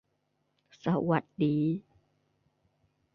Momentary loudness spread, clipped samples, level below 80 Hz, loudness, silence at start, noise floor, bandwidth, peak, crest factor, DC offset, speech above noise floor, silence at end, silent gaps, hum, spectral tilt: 8 LU; under 0.1%; -70 dBFS; -30 LUFS; 0.85 s; -77 dBFS; 6.4 kHz; -14 dBFS; 20 dB; under 0.1%; 48 dB; 1.35 s; none; none; -9.5 dB/octave